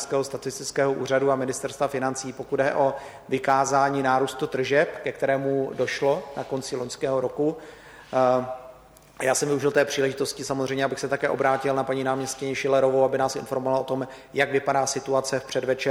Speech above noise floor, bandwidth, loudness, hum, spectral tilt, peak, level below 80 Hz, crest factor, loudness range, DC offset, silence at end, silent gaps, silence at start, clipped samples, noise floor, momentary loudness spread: 25 dB; 16 kHz; -25 LUFS; none; -4 dB/octave; -8 dBFS; -62 dBFS; 18 dB; 3 LU; under 0.1%; 0 s; none; 0 s; under 0.1%; -49 dBFS; 8 LU